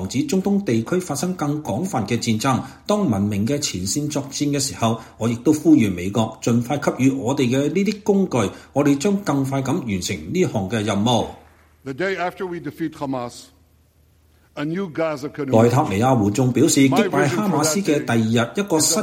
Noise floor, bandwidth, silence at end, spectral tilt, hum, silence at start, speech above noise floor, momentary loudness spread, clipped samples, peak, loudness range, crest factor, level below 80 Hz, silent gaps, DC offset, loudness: -56 dBFS; 16.5 kHz; 0 s; -5 dB/octave; none; 0 s; 36 dB; 10 LU; under 0.1%; -2 dBFS; 8 LU; 18 dB; -52 dBFS; none; under 0.1%; -20 LUFS